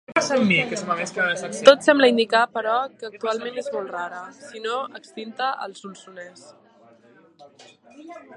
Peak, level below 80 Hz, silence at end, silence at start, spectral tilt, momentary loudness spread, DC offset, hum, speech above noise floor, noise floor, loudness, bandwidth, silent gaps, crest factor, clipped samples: 0 dBFS; -72 dBFS; 0 s; 0.1 s; -4 dB/octave; 24 LU; under 0.1%; none; 31 dB; -54 dBFS; -21 LUFS; 11 kHz; none; 24 dB; under 0.1%